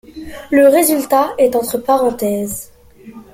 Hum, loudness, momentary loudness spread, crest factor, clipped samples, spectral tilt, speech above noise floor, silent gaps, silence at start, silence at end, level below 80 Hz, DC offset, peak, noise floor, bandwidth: none; -14 LUFS; 16 LU; 14 dB; under 0.1%; -4 dB/octave; 25 dB; none; 0.15 s; 0.1 s; -48 dBFS; under 0.1%; -2 dBFS; -38 dBFS; 16.5 kHz